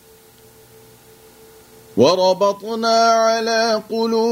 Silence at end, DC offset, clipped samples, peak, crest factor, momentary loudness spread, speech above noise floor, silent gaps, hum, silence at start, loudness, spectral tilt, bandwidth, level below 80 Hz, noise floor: 0 s; under 0.1%; under 0.1%; -2 dBFS; 18 dB; 6 LU; 31 dB; none; none; 1.95 s; -17 LUFS; -4 dB/octave; 16 kHz; -64 dBFS; -47 dBFS